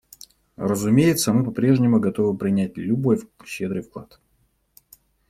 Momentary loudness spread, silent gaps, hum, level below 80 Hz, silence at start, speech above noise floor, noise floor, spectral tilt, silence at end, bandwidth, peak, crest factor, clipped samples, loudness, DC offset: 13 LU; none; none; -58 dBFS; 0.6 s; 45 dB; -66 dBFS; -6.5 dB/octave; 1.25 s; 16 kHz; -4 dBFS; 18 dB; under 0.1%; -21 LUFS; under 0.1%